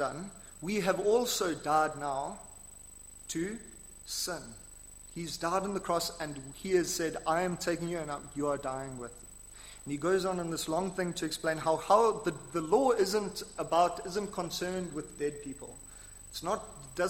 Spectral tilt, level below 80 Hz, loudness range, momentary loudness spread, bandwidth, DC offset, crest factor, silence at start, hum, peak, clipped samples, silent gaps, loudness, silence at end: -4 dB/octave; -56 dBFS; 7 LU; 20 LU; 16.5 kHz; under 0.1%; 22 dB; 0 s; none; -12 dBFS; under 0.1%; none; -32 LUFS; 0 s